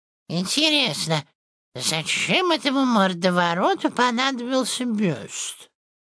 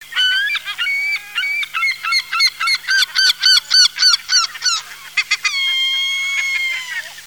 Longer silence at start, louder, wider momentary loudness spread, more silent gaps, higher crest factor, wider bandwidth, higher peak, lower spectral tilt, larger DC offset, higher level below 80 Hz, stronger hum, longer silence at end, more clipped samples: first, 0.3 s vs 0 s; second, -21 LUFS vs -14 LUFS; about the same, 10 LU vs 9 LU; first, 1.35-1.72 s vs none; about the same, 18 dB vs 16 dB; second, 11 kHz vs over 20 kHz; second, -4 dBFS vs 0 dBFS; first, -3.5 dB/octave vs 5 dB/octave; second, under 0.1% vs 0.2%; second, -72 dBFS vs -64 dBFS; second, none vs 50 Hz at -65 dBFS; first, 0.4 s vs 0 s; neither